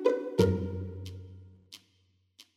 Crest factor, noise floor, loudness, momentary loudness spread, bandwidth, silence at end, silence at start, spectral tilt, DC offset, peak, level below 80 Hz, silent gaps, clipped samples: 22 dB; -70 dBFS; -30 LUFS; 25 LU; 15.5 kHz; 0.15 s; 0 s; -7 dB/octave; under 0.1%; -10 dBFS; -56 dBFS; none; under 0.1%